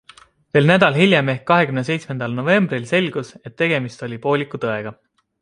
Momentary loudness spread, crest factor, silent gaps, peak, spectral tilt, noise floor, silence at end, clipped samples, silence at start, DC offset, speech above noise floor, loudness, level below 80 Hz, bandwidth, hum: 13 LU; 18 dB; none; -2 dBFS; -6.5 dB/octave; -48 dBFS; 0.5 s; under 0.1%; 0.55 s; under 0.1%; 30 dB; -18 LUFS; -60 dBFS; 11 kHz; none